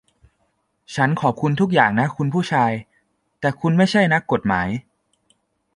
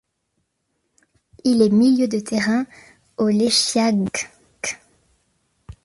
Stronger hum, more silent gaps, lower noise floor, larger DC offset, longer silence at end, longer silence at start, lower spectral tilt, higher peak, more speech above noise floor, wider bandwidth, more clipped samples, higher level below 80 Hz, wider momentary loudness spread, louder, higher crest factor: neither; neither; second, -68 dBFS vs -73 dBFS; neither; first, 0.95 s vs 0.15 s; second, 0.9 s vs 1.45 s; first, -6.5 dB/octave vs -4 dB/octave; about the same, -2 dBFS vs -4 dBFS; second, 50 dB vs 55 dB; about the same, 11.5 kHz vs 11.5 kHz; neither; about the same, -52 dBFS vs -56 dBFS; second, 9 LU vs 16 LU; about the same, -19 LUFS vs -19 LUFS; about the same, 20 dB vs 16 dB